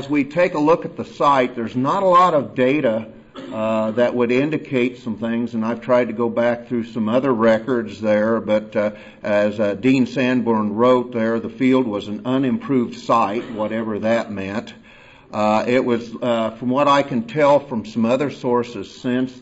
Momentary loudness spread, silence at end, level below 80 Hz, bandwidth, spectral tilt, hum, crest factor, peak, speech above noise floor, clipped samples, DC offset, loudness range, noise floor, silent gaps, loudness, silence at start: 9 LU; 0 s; -58 dBFS; 8 kHz; -7 dB/octave; none; 14 dB; -6 dBFS; 27 dB; under 0.1%; under 0.1%; 3 LU; -46 dBFS; none; -19 LUFS; 0 s